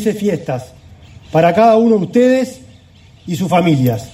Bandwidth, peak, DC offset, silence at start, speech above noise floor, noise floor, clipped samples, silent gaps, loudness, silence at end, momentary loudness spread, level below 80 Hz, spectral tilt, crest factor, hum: 16 kHz; 0 dBFS; under 0.1%; 0 s; 30 dB; -43 dBFS; under 0.1%; none; -13 LUFS; 0.05 s; 14 LU; -50 dBFS; -7 dB/octave; 14 dB; none